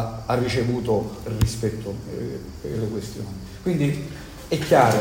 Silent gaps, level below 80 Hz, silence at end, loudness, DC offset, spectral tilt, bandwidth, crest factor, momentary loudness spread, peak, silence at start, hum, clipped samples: none; -40 dBFS; 0 s; -25 LUFS; under 0.1%; -6 dB/octave; 16.5 kHz; 20 dB; 13 LU; -4 dBFS; 0 s; none; under 0.1%